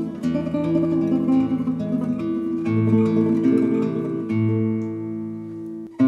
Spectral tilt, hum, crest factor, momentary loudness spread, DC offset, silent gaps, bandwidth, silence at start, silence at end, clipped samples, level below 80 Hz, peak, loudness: -9.5 dB/octave; none; 14 dB; 11 LU; under 0.1%; none; 7.6 kHz; 0 s; 0 s; under 0.1%; -56 dBFS; -6 dBFS; -22 LUFS